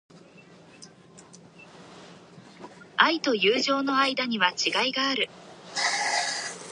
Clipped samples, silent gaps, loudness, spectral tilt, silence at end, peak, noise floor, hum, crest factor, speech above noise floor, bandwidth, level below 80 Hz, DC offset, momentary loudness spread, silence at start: under 0.1%; none; -24 LUFS; -1.5 dB/octave; 0 s; -2 dBFS; -52 dBFS; none; 26 dB; 27 dB; 11.5 kHz; -76 dBFS; under 0.1%; 12 LU; 0.15 s